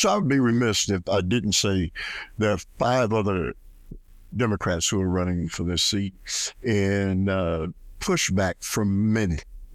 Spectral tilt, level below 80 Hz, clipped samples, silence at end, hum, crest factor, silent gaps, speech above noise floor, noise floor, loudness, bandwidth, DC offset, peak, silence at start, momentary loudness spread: -4.5 dB/octave; -44 dBFS; under 0.1%; 0 s; none; 14 dB; none; 20 dB; -44 dBFS; -24 LUFS; 15.5 kHz; under 0.1%; -10 dBFS; 0 s; 8 LU